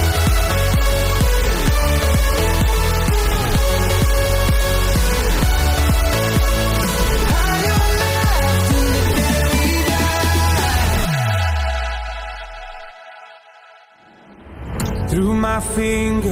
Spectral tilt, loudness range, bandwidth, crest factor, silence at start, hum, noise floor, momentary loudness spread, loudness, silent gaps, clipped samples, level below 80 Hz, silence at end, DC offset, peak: -4.5 dB/octave; 8 LU; 16 kHz; 10 dB; 0 s; none; -47 dBFS; 7 LU; -17 LUFS; none; under 0.1%; -20 dBFS; 0 s; under 0.1%; -6 dBFS